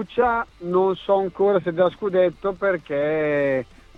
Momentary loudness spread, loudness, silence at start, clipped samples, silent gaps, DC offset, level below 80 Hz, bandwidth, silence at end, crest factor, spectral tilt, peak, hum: 4 LU; -22 LUFS; 0 s; under 0.1%; none; under 0.1%; -52 dBFS; 5.8 kHz; 0.35 s; 16 dB; -8 dB/octave; -6 dBFS; none